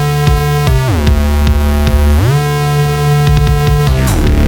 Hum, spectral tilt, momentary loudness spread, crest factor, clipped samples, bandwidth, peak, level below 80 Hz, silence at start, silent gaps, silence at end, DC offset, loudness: none; -6.5 dB/octave; 2 LU; 10 dB; under 0.1%; 17.5 kHz; 0 dBFS; -14 dBFS; 0 s; none; 0 s; under 0.1%; -11 LUFS